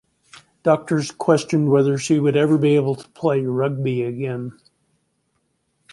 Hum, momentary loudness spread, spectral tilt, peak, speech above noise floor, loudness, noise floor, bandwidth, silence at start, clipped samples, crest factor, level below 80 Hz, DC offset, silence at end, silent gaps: none; 9 LU; -7 dB/octave; -2 dBFS; 51 dB; -20 LUFS; -69 dBFS; 11.5 kHz; 0.65 s; under 0.1%; 18 dB; -64 dBFS; under 0.1%; 1.4 s; none